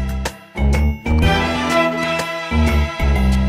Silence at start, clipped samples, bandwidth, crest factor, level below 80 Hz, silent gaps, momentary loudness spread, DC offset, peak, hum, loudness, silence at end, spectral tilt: 0 s; under 0.1%; 15 kHz; 14 dB; -20 dBFS; none; 6 LU; under 0.1%; -4 dBFS; none; -18 LUFS; 0 s; -6 dB/octave